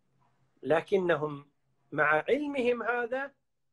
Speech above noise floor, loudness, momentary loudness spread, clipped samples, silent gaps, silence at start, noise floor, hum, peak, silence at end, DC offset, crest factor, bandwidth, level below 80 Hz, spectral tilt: 43 dB; -29 LUFS; 13 LU; under 0.1%; none; 0.65 s; -72 dBFS; none; -12 dBFS; 0.45 s; under 0.1%; 18 dB; 11 kHz; -70 dBFS; -6.5 dB/octave